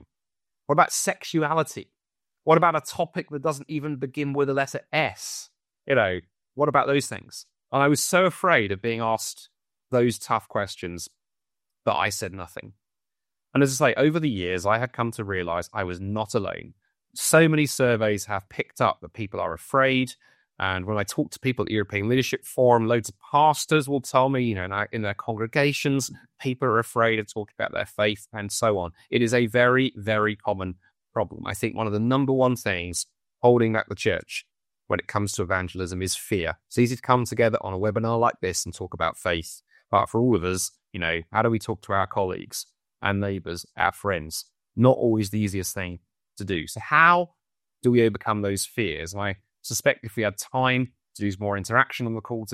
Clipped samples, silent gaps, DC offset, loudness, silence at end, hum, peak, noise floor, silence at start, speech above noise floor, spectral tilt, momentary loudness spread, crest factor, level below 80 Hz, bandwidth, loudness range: under 0.1%; none; under 0.1%; -24 LUFS; 0 s; none; -4 dBFS; under -90 dBFS; 0.7 s; over 66 dB; -4.5 dB/octave; 13 LU; 22 dB; -56 dBFS; 15.5 kHz; 4 LU